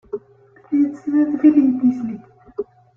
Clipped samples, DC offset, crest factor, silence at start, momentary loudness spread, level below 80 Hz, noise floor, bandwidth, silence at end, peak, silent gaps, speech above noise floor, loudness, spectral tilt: under 0.1%; under 0.1%; 16 dB; 0.15 s; 19 LU; -62 dBFS; -50 dBFS; 2.9 kHz; 0.35 s; -4 dBFS; none; 34 dB; -17 LUFS; -9.5 dB/octave